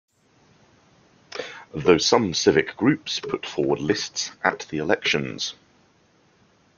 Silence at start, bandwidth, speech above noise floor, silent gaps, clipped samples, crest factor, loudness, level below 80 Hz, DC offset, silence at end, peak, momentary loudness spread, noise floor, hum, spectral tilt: 1.35 s; 7.4 kHz; 38 dB; none; under 0.1%; 24 dB; -22 LUFS; -58 dBFS; under 0.1%; 1.25 s; -2 dBFS; 14 LU; -60 dBFS; none; -4 dB/octave